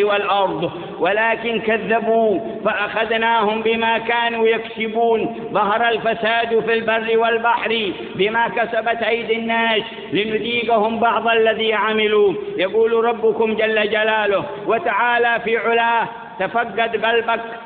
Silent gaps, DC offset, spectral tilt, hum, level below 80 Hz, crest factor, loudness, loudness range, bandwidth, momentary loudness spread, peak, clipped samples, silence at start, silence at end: none; under 0.1%; -9.5 dB/octave; none; -58 dBFS; 14 dB; -18 LUFS; 2 LU; 4.6 kHz; 5 LU; -4 dBFS; under 0.1%; 0 s; 0 s